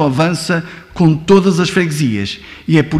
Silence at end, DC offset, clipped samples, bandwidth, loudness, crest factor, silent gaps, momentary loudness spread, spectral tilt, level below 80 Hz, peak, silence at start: 0 s; under 0.1%; under 0.1%; 13.5 kHz; -14 LUFS; 12 dB; none; 12 LU; -6 dB/octave; -44 dBFS; -2 dBFS; 0 s